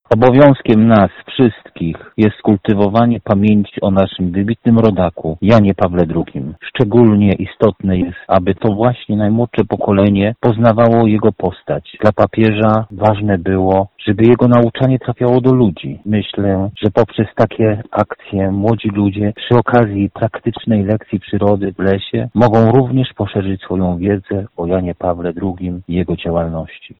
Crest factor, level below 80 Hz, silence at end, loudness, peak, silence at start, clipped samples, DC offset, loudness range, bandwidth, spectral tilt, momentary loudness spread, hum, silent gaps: 12 dB; -40 dBFS; 0.15 s; -14 LUFS; 0 dBFS; 0.1 s; under 0.1%; under 0.1%; 3 LU; 5.8 kHz; -10 dB/octave; 9 LU; none; none